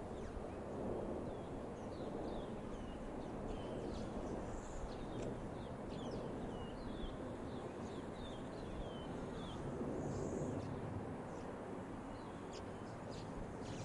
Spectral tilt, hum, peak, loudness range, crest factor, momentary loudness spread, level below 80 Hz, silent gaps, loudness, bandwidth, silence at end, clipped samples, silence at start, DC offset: -6.5 dB/octave; none; -30 dBFS; 2 LU; 14 dB; 5 LU; -56 dBFS; none; -47 LUFS; 11.5 kHz; 0 s; under 0.1%; 0 s; under 0.1%